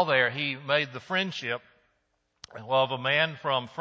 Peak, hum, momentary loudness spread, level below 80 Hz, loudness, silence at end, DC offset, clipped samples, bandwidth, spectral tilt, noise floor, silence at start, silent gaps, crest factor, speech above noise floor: -8 dBFS; none; 10 LU; -74 dBFS; -27 LUFS; 0 s; under 0.1%; under 0.1%; 7.8 kHz; -5 dB/octave; -75 dBFS; 0 s; none; 20 dB; 47 dB